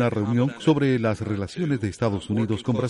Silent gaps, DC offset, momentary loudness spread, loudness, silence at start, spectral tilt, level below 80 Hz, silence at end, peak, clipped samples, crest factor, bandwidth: none; under 0.1%; 6 LU; -24 LUFS; 0 s; -7.5 dB/octave; -54 dBFS; 0 s; -6 dBFS; under 0.1%; 16 dB; 11.5 kHz